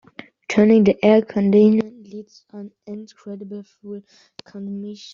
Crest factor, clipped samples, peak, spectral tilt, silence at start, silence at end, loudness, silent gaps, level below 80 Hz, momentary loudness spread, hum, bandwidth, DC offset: 16 dB; under 0.1%; -2 dBFS; -7 dB/octave; 0.5 s; 0.2 s; -16 LUFS; none; -60 dBFS; 24 LU; none; 7.2 kHz; under 0.1%